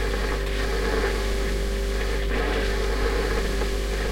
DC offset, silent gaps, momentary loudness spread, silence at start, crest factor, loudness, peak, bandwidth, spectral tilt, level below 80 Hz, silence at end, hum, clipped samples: under 0.1%; none; 2 LU; 0 s; 12 dB; -26 LUFS; -12 dBFS; 16 kHz; -4.5 dB/octave; -26 dBFS; 0 s; none; under 0.1%